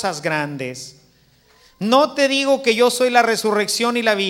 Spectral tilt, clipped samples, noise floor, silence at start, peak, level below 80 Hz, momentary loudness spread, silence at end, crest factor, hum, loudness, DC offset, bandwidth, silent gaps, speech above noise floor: -3 dB/octave; under 0.1%; -55 dBFS; 0 s; 0 dBFS; -64 dBFS; 13 LU; 0 s; 18 dB; none; -17 LUFS; under 0.1%; 16.5 kHz; none; 37 dB